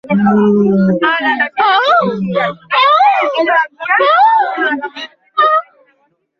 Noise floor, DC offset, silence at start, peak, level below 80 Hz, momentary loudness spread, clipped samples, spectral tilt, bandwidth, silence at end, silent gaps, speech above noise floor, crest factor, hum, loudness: -58 dBFS; under 0.1%; 0.05 s; -2 dBFS; -56 dBFS; 8 LU; under 0.1%; -7 dB/octave; 6.6 kHz; 0.8 s; none; 47 dB; 12 dB; none; -12 LUFS